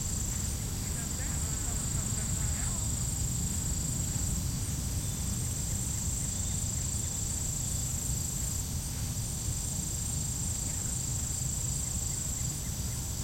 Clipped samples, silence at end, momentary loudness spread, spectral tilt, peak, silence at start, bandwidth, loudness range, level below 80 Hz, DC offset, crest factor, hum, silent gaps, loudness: under 0.1%; 0 s; 2 LU; -3.5 dB/octave; -20 dBFS; 0 s; 16.5 kHz; 1 LU; -40 dBFS; under 0.1%; 14 dB; none; none; -32 LUFS